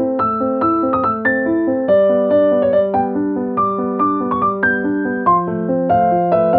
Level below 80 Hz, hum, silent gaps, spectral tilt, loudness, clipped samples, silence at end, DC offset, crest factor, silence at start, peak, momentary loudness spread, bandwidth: -50 dBFS; none; none; -11.5 dB/octave; -16 LUFS; under 0.1%; 0 s; under 0.1%; 12 dB; 0 s; -2 dBFS; 4 LU; 4.4 kHz